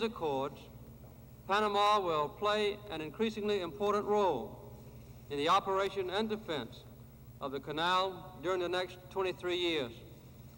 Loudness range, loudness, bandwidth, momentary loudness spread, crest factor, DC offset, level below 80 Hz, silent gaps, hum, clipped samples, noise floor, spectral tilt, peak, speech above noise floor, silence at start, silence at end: 4 LU; -34 LUFS; 16.5 kHz; 23 LU; 16 dB; under 0.1%; -60 dBFS; none; none; under 0.1%; -53 dBFS; -4.5 dB/octave; -18 dBFS; 19 dB; 0 s; 0 s